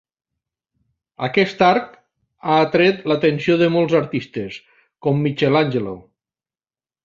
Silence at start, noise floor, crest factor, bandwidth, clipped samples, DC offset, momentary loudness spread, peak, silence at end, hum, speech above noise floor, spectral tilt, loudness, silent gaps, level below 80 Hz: 1.2 s; under -90 dBFS; 18 dB; 7.4 kHz; under 0.1%; under 0.1%; 14 LU; -2 dBFS; 1.05 s; none; over 73 dB; -7.5 dB/octave; -18 LUFS; none; -58 dBFS